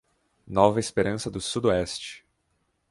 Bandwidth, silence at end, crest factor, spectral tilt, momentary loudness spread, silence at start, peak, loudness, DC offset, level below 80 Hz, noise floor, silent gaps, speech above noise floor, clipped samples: 11.5 kHz; 0.7 s; 24 dB; -5 dB/octave; 11 LU; 0.5 s; -4 dBFS; -25 LUFS; under 0.1%; -52 dBFS; -73 dBFS; none; 48 dB; under 0.1%